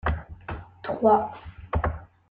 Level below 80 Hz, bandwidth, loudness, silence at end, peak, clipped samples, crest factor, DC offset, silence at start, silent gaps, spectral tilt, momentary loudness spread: -38 dBFS; 4.7 kHz; -26 LUFS; 0.25 s; -8 dBFS; under 0.1%; 20 dB; under 0.1%; 0.05 s; none; -10 dB/octave; 18 LU